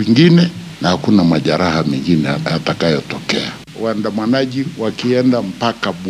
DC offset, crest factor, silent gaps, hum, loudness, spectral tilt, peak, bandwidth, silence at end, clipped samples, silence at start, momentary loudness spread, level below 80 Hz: under 0.1%; 14 dB; none; none; -15 LUFS; -6.5 dB/octave; 0 dBFS; 12 kHz; 0 s; under 0.1%; 0 s; 8 LU; -50 dBFS